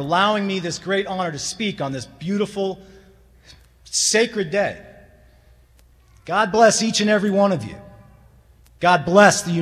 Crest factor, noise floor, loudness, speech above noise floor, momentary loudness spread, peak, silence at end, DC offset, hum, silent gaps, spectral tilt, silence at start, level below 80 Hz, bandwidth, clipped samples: 20 dB; -53 dBFS; -19 LUFS; 34 dB; 13 LU; 0 dBFS; 0 s; under 0.1%; none; none; -3.5 dB/octave; 0 s; -54 dBFS; 14.5 kHz; under 0.1%